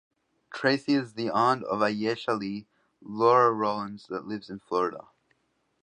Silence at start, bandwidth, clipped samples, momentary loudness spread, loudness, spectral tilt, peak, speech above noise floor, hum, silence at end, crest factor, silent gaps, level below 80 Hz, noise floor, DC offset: 0.5 s; 10 kHz; under 0.1%; 16 LU; -27 LUFS; -6 dB/octave; -8 dBFS; 47 dB; none; 0.8 s; 20 dB; none; -72 dBFS; -74 dBFS; under 0.1%